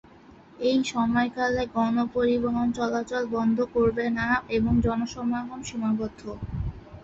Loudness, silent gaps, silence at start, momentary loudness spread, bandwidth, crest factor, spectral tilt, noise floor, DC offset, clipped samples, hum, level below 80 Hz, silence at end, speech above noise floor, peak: -26 LUFS; none; 0.3 s; 10 LU; 7.8 kHz; 16 dB; -6 dB/octave; -51 dBFS; under 0.1%; under 0.1%; none; -44 dBFS; 0 s; 26 dB; -10 dBFS